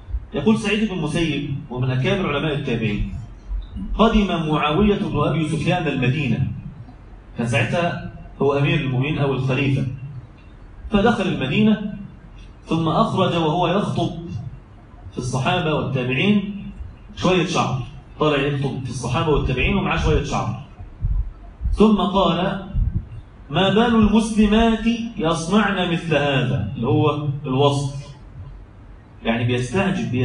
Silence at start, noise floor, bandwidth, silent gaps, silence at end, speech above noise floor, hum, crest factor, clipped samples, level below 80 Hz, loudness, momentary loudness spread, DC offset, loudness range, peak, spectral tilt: 0 s; -42 dBFS; 10.5 kHz; none; 0 s; 23 dB; none; 18 dB; under 0.1%; -34 dBFS; -20 LUFS; 17 LU; under 0.1%; 4 LU; -2 dBFS; -6.5 dB/octave